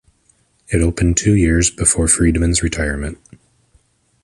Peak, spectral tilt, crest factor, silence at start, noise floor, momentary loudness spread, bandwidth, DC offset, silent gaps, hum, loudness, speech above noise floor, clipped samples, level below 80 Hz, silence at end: 0 dBFS; -4.5 dB/octave; 18 dB; 0.7 s; -58 dBFS; 9 LU; 11.5 kHz; under 0.1%; none; none; -15 LUFS; 43 dB; under 0.1%; -26 dBFS; 1.1 s